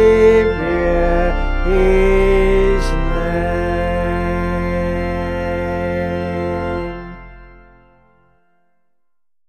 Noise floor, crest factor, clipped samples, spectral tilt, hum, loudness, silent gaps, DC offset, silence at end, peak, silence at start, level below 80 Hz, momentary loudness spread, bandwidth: -83 dBFS; 16 dB; under 0.1%; -7.5 dB/octave; none; -17 LUFS; none; under 0.1%; 2 s; -2 dBFS; 0 s; -22 dBFS; 8 LU; 9.6 kHz